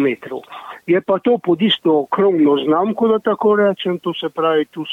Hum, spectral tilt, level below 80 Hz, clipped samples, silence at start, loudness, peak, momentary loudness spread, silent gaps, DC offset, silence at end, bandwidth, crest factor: none; -7.5 dB/octave; -66 dBFS; under 0.1%; 0 s; -16 LUFS; -4 dBFS; 10 LU; none; under 0.1%; 0 s; 4.3 kHz; 12 dB